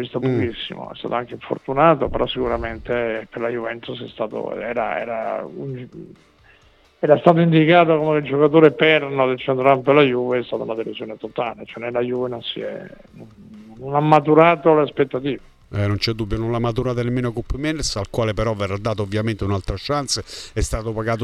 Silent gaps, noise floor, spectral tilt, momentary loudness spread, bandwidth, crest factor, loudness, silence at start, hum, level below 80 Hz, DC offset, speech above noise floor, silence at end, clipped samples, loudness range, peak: none; -54 dBFS; -6 dB/octave; 15 LU; 13 kHz; 20 dB; -20 LUFS; 0 s; none; -38 dBFS; under 0.1%; 34 dB; 0 s; under 0.1%; 10 LU; 0 dBFS